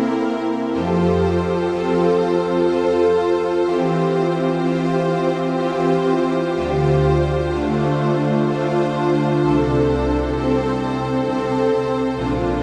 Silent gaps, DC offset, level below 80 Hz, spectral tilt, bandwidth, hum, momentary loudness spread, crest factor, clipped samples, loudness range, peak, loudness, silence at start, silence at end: none; under 0.1%; -36 dBFS; -8 dB/octave; 10 kHz; none; 4 LU; 12 dB; under 0.1%; 1 LU; -6 dBFS; -19 LUFS; 0 s; 0 s